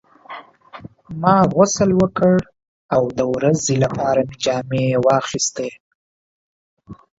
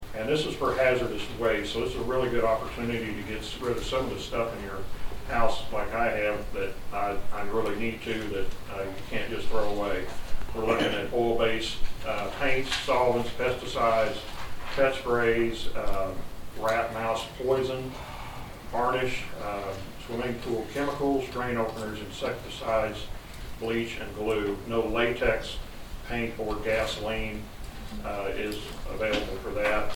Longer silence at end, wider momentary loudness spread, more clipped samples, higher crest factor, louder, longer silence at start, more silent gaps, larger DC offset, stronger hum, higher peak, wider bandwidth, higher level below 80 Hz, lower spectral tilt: first, 0.25 s vs 0 s; first, 15 LU vs 12 LU; neither; about the same, 18 dB vs 18 dB; first, -18 LUFS vs -30 LUFS; first, 0.3 s vs 0 s; first, 2.68-2.89 s, 5.80-6.77 s vs none; neither; neither; first, 0 dBFS vs -8 dBFS; second, 8 kHz vs 17.5 kHz; second, -50 dBFS vs -40 dBFS; about the same, -5.5 dB/octave vs -5 dB/octave